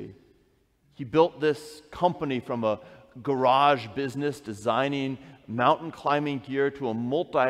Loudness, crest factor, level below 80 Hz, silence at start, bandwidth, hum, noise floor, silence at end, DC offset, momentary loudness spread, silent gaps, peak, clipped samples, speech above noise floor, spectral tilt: -27 LUFS; 20 dB; -64 dBFS; 0 s; 14 kHz; none; -65 dBFS; 0 s; under 0.1%; 12 LU; none; -8 dBFS; under 0.1%; 39 dB; -6 dB/octave